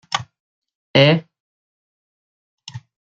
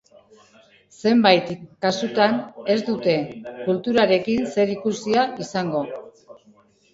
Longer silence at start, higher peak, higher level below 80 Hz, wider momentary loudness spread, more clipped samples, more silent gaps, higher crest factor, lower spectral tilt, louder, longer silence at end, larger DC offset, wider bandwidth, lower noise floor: second, 0.1 s vs 1 s; about the same, 0 dBFS vs 0 dBFS; about the same, -64 dBFS vs -62 dBFS; first, 24 LU vs 10 LU; neither; first, 0.40-0.62 s, 0.75-0.94 s, 1.40-2.58 s vs none; about the same, 22 dB vs 22 dB; about the same, -5.5 dB/octave vs -5.5 dB/octave; first, -17 LUFS vs -21 LUFS; second, 0.35 s vs 0.85 s; neither; about the same, 7.8 kHz vs 7.8 kHz; first, under -90 dBFS vs -56 dBFS